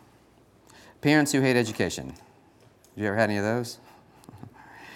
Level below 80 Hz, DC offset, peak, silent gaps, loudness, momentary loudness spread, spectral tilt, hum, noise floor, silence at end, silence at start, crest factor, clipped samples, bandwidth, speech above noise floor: -64 dBFS; under 0.1%; -6 dBFS; none; -25 LUFS; 26 LU; -5 dB/octave; none; -58 dBFS; 0 s; 1.05 s; 22 dB; under 0.1%; 17 kHz; 33 dB